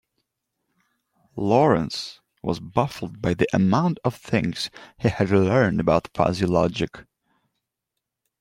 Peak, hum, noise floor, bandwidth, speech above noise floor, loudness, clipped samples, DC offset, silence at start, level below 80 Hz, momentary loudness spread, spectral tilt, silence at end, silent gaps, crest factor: -4 dBFS; none; -83 dBFS; 15.5 kHz; 61 dB; -23 LUFS; under 0.1%; under 0.1%; 1.35 s; -52 dBFS; 12 LU; -7 dB/octave; 1.4 s; none; 20 dB